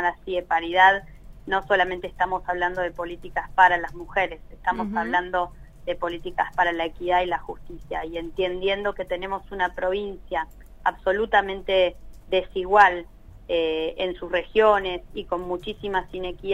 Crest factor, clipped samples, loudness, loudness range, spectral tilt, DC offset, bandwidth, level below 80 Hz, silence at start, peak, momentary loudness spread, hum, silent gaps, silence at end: 20 dB; under 0.1%; -24 LUFS; 5 LU; -5 dB/octave; under 0.1%; 13.5 kHz; -44 dBFS; 0 s; -4 dBFS; 13 LU; none; none; 0 s